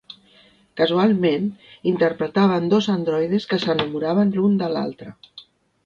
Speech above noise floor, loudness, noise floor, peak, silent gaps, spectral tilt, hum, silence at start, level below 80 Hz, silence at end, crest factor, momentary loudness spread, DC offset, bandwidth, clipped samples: 34 dB; -20 LUFS; -54 dBFS; -6 dBFS; none; -7.5 dB/octave; none; 0.1 s; -62 dBFS; 0.45 s; 16 dB; 10 LU; under 0.1%; 7.2 kHz; under 0.1%